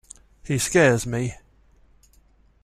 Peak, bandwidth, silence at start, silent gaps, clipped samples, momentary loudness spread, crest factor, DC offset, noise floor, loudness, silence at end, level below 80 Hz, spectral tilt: -4 dBFS; 14.5 kHz; 0.45 s; none; under 0.1%; 14 LU; 22 dB; under 0.1%; -57 dBFS; -21 LUFS; 1.3 s; -50 dBFS; -5 dB/octave